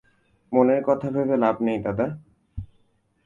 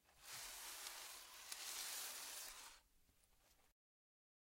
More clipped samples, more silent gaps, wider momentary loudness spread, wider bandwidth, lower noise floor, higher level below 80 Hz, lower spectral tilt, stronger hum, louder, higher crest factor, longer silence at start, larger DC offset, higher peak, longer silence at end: neither; neither; first, 20 LU vs 9 LU; second, 7.2 kHz vs 16 kHz; second, -64 dBFS vs -76 dBFS; first, -50 dBFS vs -80 dBFS; first, -9.5 dB/octave vs 2 dB/octave; neither; first, -23 LUFS vs -51 LUFS; about the same, 20 dB vs 24 dB; first, 0.5 s vs 0.05 s; neither; first, -6 dBFS vs -32 dBFS; second, 0.6 s vs 0.8 s